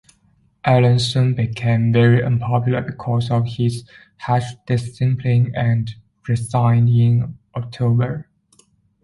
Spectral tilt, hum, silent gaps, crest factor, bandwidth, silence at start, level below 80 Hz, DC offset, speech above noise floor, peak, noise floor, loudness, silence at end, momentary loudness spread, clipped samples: -7.5 dB/octave; none; none; 16 dB; 11.5 kHz; 0.65 s; -48 dBFS; under 0.1%; 42 dB; -2 dBFS; -59 dBFS; -18 LUFS; 0.8 s; 11 LU; under 0.1%